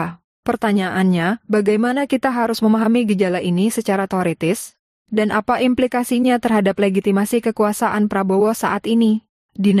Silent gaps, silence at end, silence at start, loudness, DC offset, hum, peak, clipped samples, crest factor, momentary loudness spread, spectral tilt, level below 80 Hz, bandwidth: 0.24-0.43 s, 4.79-5.05 s, 9.29-9.49 s; 0 s; 0 s; -18 LUFS; under 0.1%; none; -6 dBFS; under 0.1%; 12 dB; 5 LU; -6 dB/octave; -56 dBFS; 15.5 kHz